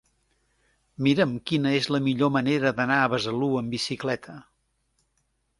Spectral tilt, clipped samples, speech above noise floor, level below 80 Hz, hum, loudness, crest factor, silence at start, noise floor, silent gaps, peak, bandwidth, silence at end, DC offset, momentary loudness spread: -6 dB/octave; under 0.1%; 48 dB; -62 dBFS; none; -25 LUFS; 20 dB; 1 s; -73 dBFS; none; -8 dBFS; 11.5 kHz; 1.2 s; under 0.1%; 7 LU